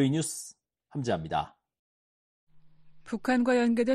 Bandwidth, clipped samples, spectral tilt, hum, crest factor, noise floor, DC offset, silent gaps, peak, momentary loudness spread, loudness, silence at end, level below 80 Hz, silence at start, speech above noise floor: 13 kHz; under 0.1%; -5.5 dB/octave; none; 16 dB; -53 dBFS; under 0.1%; 1.79-2.47 s; -14 dBFS; 16 LU; -29 LUFS; 0 s; -62 dBFS; 0 s; 26 dB